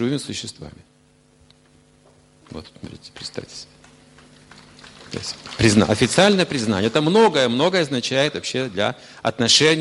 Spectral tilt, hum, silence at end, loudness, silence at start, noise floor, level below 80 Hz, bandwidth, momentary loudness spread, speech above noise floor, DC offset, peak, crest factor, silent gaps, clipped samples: -4 dB/octave; none; 0 s; -19 LUFS; 0 s; -56 dBFS; -50 dBFS; 11.5 kHz; 23 LU; 36 dB; under 0.1%; -2 dBFS; 20 dB; none; under 0.1%